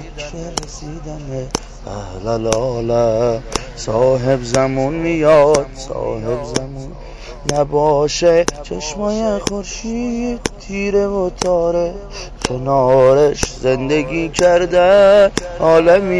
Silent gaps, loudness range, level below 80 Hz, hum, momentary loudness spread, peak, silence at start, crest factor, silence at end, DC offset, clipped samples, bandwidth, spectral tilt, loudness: none; 7 LU; -34 dBFS; none; 17 LU; 0 dBFS; 0 s; 14 dB; 0 s; under 0.1%; under 0.1%; 11 kHz; -5 dB/octave; -16 LUFS